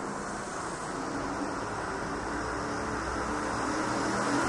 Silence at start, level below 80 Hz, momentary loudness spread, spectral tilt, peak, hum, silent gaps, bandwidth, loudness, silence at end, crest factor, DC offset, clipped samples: 0 s; -50 dBFS; 6 LU; -4 dB/octave; -16 dBFS; none; none; 11.5 kHz; -33 LUFS; 0 s; 16 dB; under 0.1%; under 0.1%